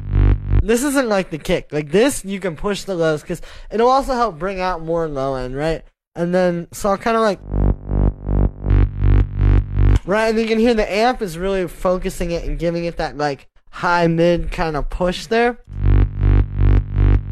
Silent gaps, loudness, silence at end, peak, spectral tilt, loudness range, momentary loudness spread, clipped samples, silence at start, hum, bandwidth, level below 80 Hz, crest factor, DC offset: 6.07-6.12 s; -19 LUFS; 0 s; -4 dBFS; -6.5 dB/octave; 3 LU; 7 LU; under 0.1%; 0 s; none; 13.5 kHz; -22 dBFS; 14 dB; under 0.1%